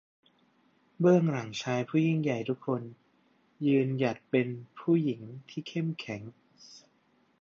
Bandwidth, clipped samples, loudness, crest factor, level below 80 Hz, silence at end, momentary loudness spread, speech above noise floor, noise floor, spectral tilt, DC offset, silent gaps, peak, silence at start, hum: 7.4 kHz; under 0.1%; -30 LUFS; 20 dB; -76 dBFS; 0.65 s; 15 LU; 40 dB; -69 dBFS; -7.5 dB/octave; under 0.1%; none; -10 dBFS; 1 s; none